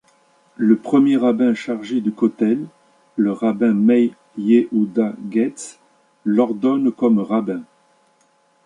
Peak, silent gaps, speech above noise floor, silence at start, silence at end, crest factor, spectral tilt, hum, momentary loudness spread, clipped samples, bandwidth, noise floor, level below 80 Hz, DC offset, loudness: -2 dBFS; none; 42 dB; 0.6 s; 1 s; 16 dB; -7 dB/octave; none; 11 LU; under 0.1%; 10.5 kHz; -59 dBFS; -68 dBFS; under 0.1%; -18 LUFS